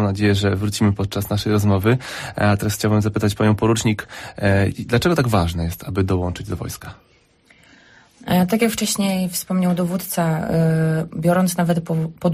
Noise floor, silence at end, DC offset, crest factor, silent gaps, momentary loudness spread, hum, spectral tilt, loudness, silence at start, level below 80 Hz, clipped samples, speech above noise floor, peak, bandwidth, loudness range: -55 dBFS; 0 s; under 0.1%; 14 dB; none; 8 LU; none; -6 dB/octave; -20 LUFS; 0 s; -42 dBFS; under 0.1%; 36 dB; -6 dBFS; 15.5 kHz; 4 LU